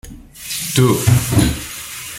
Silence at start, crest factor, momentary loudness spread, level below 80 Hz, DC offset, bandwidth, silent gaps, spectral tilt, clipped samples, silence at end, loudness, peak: 0.05 s; 16 dB; 13 LU; -32 dBFS; under 0.1%; 17 kHz; none; -5 dB/octave; under 0.1%; 0 s; -16 LUFS; 0 dBFS